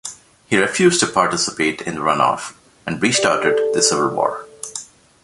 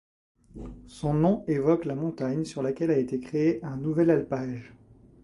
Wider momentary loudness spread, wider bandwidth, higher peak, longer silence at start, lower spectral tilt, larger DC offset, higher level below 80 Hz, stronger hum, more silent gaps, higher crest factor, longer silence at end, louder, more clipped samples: about the same, 15 LU vs 16 LU; about the same, 11.5 kHz vs 11.5 kHz; first, -2 dBFS vs -10 dBFS; second, 0.05 s vs 0.55 s; second, -3 dB/octave vs -8.5 dB/octave; neither; about the same, -56 dBFS vs -54 dBFS; neither; neither; about the same, 18 dB vs 18 dB; about the same, 0.4 s vs 0.5 s; first, -17 LUFS vs -27 LUFS; neither